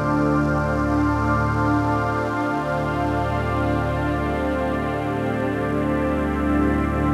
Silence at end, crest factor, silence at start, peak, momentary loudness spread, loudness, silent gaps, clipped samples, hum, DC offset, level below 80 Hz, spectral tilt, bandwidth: 0 s; 12 dB; 0 s; -8 dBFS; 3 LU; -22 LUFS; none; under 0.1%; none; under 0.1%; -34 dBFS; -8 dB/octave; 13.5 kHz